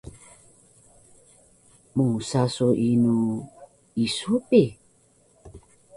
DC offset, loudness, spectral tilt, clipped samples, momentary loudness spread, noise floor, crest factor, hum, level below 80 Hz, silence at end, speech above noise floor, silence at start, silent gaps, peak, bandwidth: under 0.1%; -23 LUFS; -6.5 dB/octave; under 0.1%; 14 LU; -60 dBFS; 20 dB; none; -58 dBFS; 0.4 s; 39 dB; 0.05 s; none; -4 dBFS; 11.5 kHz